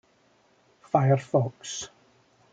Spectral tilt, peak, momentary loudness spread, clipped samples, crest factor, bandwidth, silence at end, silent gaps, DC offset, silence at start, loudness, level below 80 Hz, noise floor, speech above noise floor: -6 dB/octave; -8 dBFS; 13 LU; under 0.1%; 20 dB; 9 kHz; 0.65 s; none; under 0.1%; 0.95 s; -26 LUFS; -68 dBFS; -64 dBFS; 39 dB